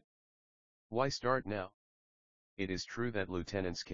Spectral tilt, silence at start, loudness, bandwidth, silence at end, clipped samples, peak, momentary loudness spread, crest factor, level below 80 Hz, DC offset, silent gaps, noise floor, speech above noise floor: -4 dB/octave; 0 s; -37 LUFS; 7.4 kHz; 0 s; under 0.1%; -16 dBFS; 8 LU; 22 dB; -62 dBFS; under 0.1%; 0.04-0.90 s, 1.74-2.57 s; under -90 dBFS; over 53 dB